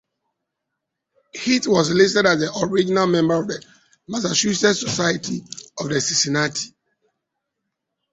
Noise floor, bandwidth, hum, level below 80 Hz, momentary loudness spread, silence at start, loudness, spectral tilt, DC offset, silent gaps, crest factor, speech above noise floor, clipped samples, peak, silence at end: -80 dBFS; 8.2 kHz; none; -58 dBFS; 14 LU; 1.35 s; -19 LUFS; -3.5 dB/octave; under 0.1%; none; 20 dB; 61 dB; under 0.1%; -2 dBFS; 1.45 s